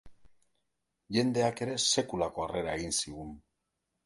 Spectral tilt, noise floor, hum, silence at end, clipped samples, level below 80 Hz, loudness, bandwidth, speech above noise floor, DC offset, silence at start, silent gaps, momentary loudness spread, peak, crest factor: -3.5 dB/octave; -83 dBFS; none; 0.65 s; under 0.1%; -58 dBFS; -31 LUFS; 12 kHz; 52 dB; under 0.1%; 0.05 s; none; 10 LU; -14 dBFS; 20 dB